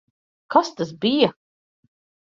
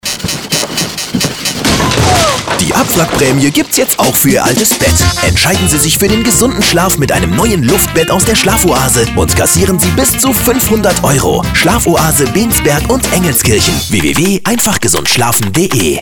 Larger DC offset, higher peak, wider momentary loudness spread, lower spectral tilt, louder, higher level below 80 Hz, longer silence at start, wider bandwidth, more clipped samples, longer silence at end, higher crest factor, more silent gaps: neither; about the same, -2 dBFS vs 0 dBFS; about the same, 5 LU vs 3 LU; first, -5 dB/octave vs -3.5 dB/octave; second, -21 LUFS vs -9 LUFS; second, -66 dBFS vs -24 dBFS; first, 0.5 s vs 0.05 s; second, 7.6 kHz vs over 20 kHz; neither; first, 0.95 s vs 0 s; first, 22 dB vs 10 dB; neither